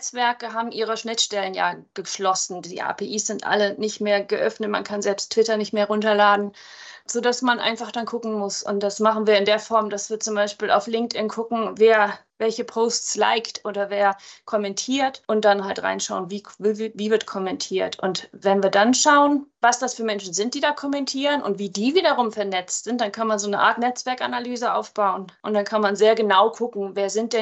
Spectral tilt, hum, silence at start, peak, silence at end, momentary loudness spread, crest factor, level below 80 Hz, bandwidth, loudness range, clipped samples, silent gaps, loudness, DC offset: -3 dB/octave; none; 0 s; -4 dBFS; 0 s; 9 LU; 18 dB; -74 dBFS; 8.6 kHz; 4 LU; under 0.1%; none; -22 LUFS; under 0.1%